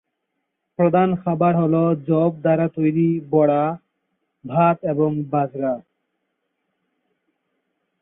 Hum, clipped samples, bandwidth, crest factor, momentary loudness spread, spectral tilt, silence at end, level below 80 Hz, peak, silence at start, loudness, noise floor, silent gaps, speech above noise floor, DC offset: none; under 0.1%; 3.8 kHz; 16 dB; 8 LU; -13.5 dB/octave; 2.2 s; -64 dBFS; -4 dBFS; 0.8 s; -19 LUFS; -76 dBFS; none; 58 dB; under 0.1%